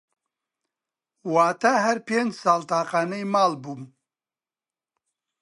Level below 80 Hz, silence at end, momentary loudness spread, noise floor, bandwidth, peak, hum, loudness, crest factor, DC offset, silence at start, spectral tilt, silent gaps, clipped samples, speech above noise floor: -80 dBFS; 1.55 s; 15 LU; under -90 dBFS; 11.5 kHz; -6 dBFS; none; -23 LUFS; 20 dB; under 0.1%; 1.25 s; -4.5 dB/octave; none; under 0.1%; over 67 dB